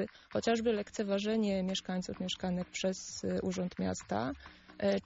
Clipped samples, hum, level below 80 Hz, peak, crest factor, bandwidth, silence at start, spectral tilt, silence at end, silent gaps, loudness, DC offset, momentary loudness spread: under 0.1%; none; -62 dBFS; -20 dBFS; 16 dB; 8 kHz; 0 s; -5 dB/octave; 0.05 s; none; -35 LUFS; under 0.1%; 6 LU